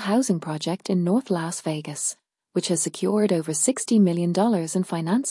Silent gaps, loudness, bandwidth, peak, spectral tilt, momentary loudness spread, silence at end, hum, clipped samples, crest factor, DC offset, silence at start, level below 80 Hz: none; -23 LUFS; 12 kHz; -8 dBFS; -5 dB/octave; 8 LU; 0 s; none; under 0.1%; 14 dB; under 0.1%; 0 s; -76 dBFS